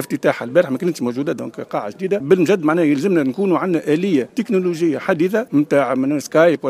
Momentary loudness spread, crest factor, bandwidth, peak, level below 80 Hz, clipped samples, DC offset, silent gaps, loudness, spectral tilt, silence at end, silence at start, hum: 8 LU; 16 dB; 15.5 kHz; 0 dBFS; -66 dBFS; under 0.1%; under 0.1%; none; -18 LUFS; -6.5 dB/octave; 0 s; 0 s; none